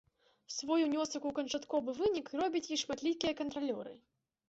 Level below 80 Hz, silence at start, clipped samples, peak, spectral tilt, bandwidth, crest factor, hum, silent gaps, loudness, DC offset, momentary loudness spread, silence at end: -70 dBFS; 0.5 s; under 0.1%; -18 dBFS; -2.5 dB/octave; 8 kHz; 18 dB; none; none; -36 LUFS; under 0.1%; 8 LU; 0.5 s